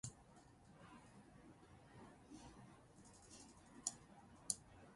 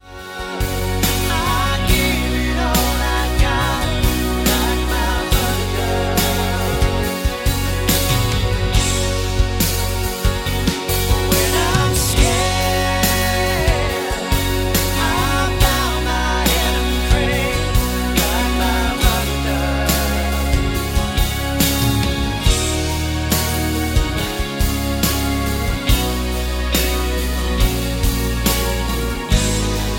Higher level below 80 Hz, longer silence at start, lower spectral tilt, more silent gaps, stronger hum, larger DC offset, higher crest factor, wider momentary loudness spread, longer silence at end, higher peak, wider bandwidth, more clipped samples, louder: second, -74 dBFS vs -22 dBFS; about the same, 0.05 s vs 0.05 s; second, -2.5 dB/octave vs -4 dB/octave; neither; neither; neither; first, 36 dB vs 16 dB; first, 19 LU vs 4 LU; about the same, 0 s vs 0 s; second, -22 dBFS vs 0 dBFS; second, 11.5 kHz vs 17 kHz; neither; second, -53 LUFS vs -18 LUFS